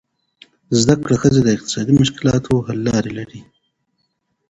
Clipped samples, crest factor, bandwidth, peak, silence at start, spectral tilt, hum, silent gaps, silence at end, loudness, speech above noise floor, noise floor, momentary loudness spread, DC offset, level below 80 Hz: under 0.1%; 18 dB; 8.2 kHz; 0 dBFS; 0.7 s; -5.5 dB/octave; none; none; 1.05 s; -16 LUFS; 54 dB; -69 dBFS; 8 LU; under 0.1%; -44 dBFS